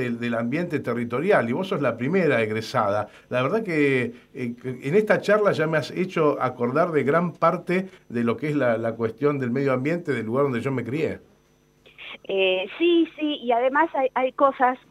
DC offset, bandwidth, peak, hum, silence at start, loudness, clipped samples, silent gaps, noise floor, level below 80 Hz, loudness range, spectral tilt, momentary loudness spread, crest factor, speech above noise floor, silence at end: under 0.1%; 14 kHz; -6 dBFS; none; 0 s; -23 LUFS; under 0.1%; none; -60 dBFS; -66 dBFS; 3 LU; -7 dB/octave; 8 LU; 18 dB; 37 dB; 0.15 s